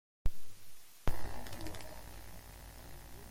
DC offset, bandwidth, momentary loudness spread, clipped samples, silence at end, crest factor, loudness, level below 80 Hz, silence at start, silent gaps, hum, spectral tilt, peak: under 0.1%; 16.5 kHz; 14 LU; under 0.1%; 0 s; 18 dB; -48 LUFS; -44 dBFS; 0.25 s; none; none; -4.5 dB/octave; -16 dBFS